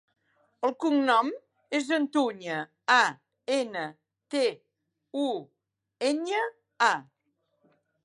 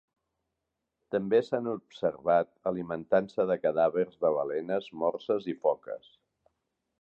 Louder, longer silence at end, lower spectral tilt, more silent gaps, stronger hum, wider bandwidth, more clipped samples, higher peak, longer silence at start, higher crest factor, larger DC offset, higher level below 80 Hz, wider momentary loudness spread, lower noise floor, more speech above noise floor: about the same, -28 LUFS vs -30 LUFS; about the same, 1.05 s vs 1.05 s; second, -3 dB/octave vs -8 dB/octave; neither; neither; first, 11.5 kHz vs 7.4 kHz; neither; about the same, -10 dBFS vs -12 dBFS; second, 0.6 s vs 1.1 s; about the same, 20 dB vs 18 dB; neither; second, -86 dBFS vs -70 dBFS; first, 12 LU vs 8 LU; second, -76 dBFS vs -85 dBFS; second, 49 dB vs 56 dB